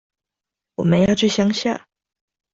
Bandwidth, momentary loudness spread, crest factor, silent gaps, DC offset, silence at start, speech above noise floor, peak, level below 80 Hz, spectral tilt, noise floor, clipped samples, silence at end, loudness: 7.8 kHz; 12 LU; 16 dB; none; under 0.1%; 0.8 s; 69 dB; -4 dBFS; -52 dBFS; -5.5 dB/octave; -86 dBFS; under 0.1%; 0.75 s; -18 LUFS